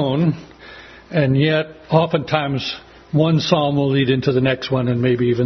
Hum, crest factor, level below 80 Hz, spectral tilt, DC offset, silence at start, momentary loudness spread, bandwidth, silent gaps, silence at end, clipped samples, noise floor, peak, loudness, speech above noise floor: none; 18 dB; -50 dBFS; -7.5 dB/octave; under 0.1%; 0 s; 11 LU; 6.4 kHz; none; 0 s; under 0.1%; -40 dBFS; 0 dBFS; -18 LUFS; 23 dB